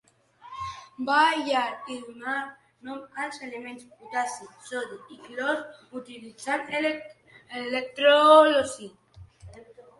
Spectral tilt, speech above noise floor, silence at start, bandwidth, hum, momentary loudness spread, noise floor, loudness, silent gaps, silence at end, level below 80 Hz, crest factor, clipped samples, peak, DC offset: -3 dB/octave; 27 dB; 0.45 s; 11.5 kHz; none; 22 LU; -53 dBFS; -24 LUFS; none; 0.2 s; -64 dBFS; 22 dB; under 0.1%; -4 dBFS; under 0.1%